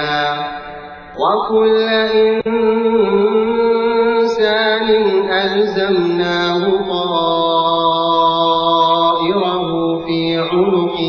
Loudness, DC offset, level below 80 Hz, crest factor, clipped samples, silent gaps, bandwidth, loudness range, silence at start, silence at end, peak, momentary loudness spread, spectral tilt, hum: -14 LUFS; under 0.1%; -50 dBFS; 12 dB; under 0.1%; none; 7 kHz; 1 LU; 0 s; 0 s; -4 dBFS; 5 LU; -6.5 dB/octave; none